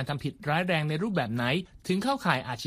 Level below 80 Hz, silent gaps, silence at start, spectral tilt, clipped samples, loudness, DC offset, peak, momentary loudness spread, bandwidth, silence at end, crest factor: -58 dBFS; none; 0 s; -6 dB/octave; under 0.1%; -29 LUFS; under 0.1%; -10 dBFS; 5 LU; 15.5 kHz; 0 s; 20 dB